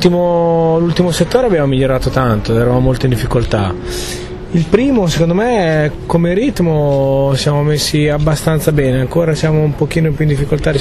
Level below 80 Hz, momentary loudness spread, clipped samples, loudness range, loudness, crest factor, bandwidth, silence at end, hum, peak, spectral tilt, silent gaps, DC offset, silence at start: -28 dBFS; 3 LU; under 0.1%; 1 LU; -13 LUFS; 12 dB; 13.5 kHz; 0 s; none; 0 dBFS; -6.5 dB/octave; none; under 0.1%; 0 s